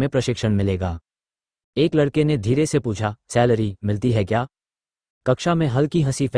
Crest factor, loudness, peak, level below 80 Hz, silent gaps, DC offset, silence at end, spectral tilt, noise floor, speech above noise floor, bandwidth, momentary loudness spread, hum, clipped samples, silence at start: 18 dB; -21 LUFS; -2 dBFS; -46 dBFS; 1.64-1.73 s, 5.10-5.21 s; under 0.1%; 0 s; -6.5 dB/octave; under -90 dBFS; over 70 dB; 10.5 kHz; 8 LU; none; under 0.1%; 0 s